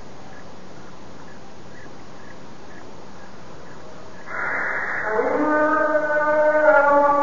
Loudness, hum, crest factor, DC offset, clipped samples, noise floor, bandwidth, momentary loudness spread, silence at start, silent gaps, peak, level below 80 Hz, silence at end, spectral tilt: -19 LUFS; none; 20 dB; 3%; under 0.1%; -42 dBFS; 7.4 kHz; 26 LU; 0 s; none; -4 dBFS; -56 dBFS; 0 s; -6 dB/octave